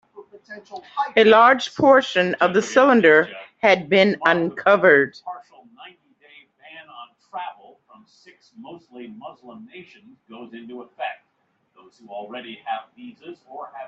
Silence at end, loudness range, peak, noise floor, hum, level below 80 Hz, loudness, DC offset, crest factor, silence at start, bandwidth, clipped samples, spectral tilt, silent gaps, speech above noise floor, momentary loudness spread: 0 s; 24 LU; 0 dBFS; -69 dBFS; none; -68 dBFS; -17 LUFS; under 0.1%; 20 dB; 0.2 s; 8 kHz; under 0.1%; -5 dB/octave; none; 49 dB; 26 LU